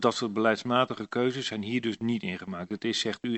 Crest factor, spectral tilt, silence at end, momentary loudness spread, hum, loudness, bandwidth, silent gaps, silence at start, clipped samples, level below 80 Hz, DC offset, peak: 20 dB; -4.5 dB/octave; 0 s; 7 LU; none; -29 LUFS; 8.4 kHz; none; 0 s; under 0.1%; -70 dBFS; under 0.1%; -8 dBFS